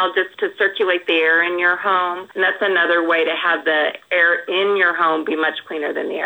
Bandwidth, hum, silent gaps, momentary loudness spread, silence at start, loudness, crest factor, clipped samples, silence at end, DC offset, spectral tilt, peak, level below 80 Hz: over 20 kHz; none; none; 6 LU; 0 s; -17 LUFS; 16 dB; under 0.1%; 0 s; under 0.1%; -4.5 dB/octave; -4 dBFS; -78 dBFS